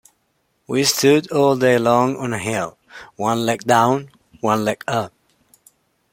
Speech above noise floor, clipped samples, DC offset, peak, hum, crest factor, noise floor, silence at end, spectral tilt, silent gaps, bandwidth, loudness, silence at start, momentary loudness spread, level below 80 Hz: 49 dB; under 0.1%; under 0.1%; -2 dBFS; none; 18 dB; -67 dBFS; 1.05 s; -4.5 dB/octave; none; 16.5 kHz; -18 LUFS; 0.7 s; 10 LU; -60 dBFS